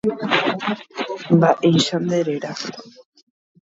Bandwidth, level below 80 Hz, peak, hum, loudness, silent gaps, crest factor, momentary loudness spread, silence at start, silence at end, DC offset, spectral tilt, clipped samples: 8 kHz; -62 dBFS; -2 dBFS; none; -19 LUFS; none; 18 dB; 13 LU; 0.05 s; 0.75 s; under 0.1%; -5.5 dB/octave; under 0.1%